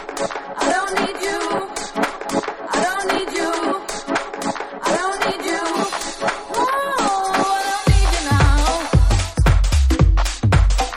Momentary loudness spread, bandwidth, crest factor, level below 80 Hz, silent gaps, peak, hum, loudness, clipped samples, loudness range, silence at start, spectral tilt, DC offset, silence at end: 7 LU; 15 kHz; 16 dB; -22 dBFS; none; -2 dBFS; none; -19 LUFS; under 0.1%; 5 LU; 0 s; -4.5 dB/octave; under 0.1%; 0 s